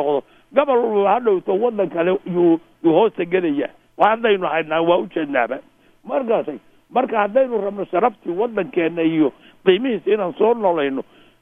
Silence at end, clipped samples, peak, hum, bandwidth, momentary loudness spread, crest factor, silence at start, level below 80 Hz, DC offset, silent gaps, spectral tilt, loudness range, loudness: 0.4 s; under 0.1%; 0 dBFS; none; 3.8 kHz; 7 LU; 18 dB; 0 s; -64 dBFS; under 0.1%; none; -8.5 dB/octave; 3 LU; -19 LUFS